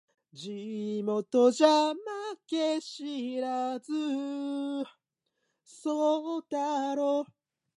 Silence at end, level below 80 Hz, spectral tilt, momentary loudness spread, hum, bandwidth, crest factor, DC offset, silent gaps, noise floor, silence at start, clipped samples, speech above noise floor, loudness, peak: 0.5 s; -88 dBFS; -4.5 dB/octave; 14 LU; none; 11.5 kHz; 20 dB; under 0.1%; none; -81 dBFS; 0.35 s; under 0.1%; 52 dB; -30 LUFS; -10 dBFS